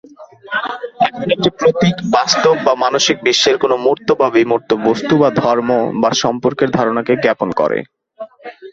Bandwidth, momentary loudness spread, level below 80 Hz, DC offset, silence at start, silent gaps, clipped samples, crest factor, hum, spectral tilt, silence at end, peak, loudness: 8 kHz; 9 LU; -52 dBFS; under 0.1%; 0.2 s; none; under 0.1%; 14 dB; none; -4 dB/octave; 0 s; 0 dBFS; -14 LUFS